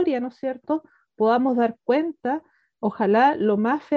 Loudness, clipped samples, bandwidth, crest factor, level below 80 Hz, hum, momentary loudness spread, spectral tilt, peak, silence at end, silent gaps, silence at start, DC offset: -23 LUFS; under 0.1%; 6.6 kHz; 16 dB; -70 dBFS; none; 11 LU; -8 dB/octave; -8 dBFS; 0 s; none; 0 s; under 0.1%